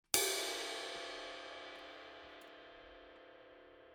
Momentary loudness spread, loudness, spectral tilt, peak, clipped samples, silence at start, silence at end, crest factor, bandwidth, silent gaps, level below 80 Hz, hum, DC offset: 24 LU; -40 LUFS; 0 dB/octave; -10 dBFS; under 0.1%; 0.15 s; 0 s; 34 dB; over 20 kHz; none; -74 dBFS; none; under 0.1%